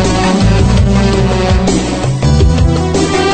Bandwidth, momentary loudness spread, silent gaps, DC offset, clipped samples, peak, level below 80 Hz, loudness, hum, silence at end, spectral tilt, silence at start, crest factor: 9.2 kHz; 3 LU; none; under 0.1%; under 0.1%; 0 dBFS; -16 dBFS; -11 LUFS; none; 0 s; -6 dB/octave; 0 s; 10 dB